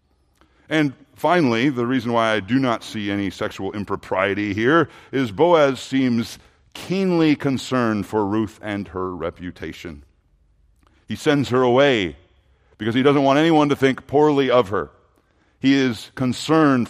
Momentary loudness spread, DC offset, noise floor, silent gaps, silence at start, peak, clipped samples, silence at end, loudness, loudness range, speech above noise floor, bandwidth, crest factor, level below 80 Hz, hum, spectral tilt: 13 LU; under 0.1%; -60 dBFS; none; 0.7 s; -2 dBFS; under 0.1%; 0 s; -20 LUFS; 6 LU; 41 dB; 14.5 kHz; 18 dB; -56 dBFS; none; -6 dB/octave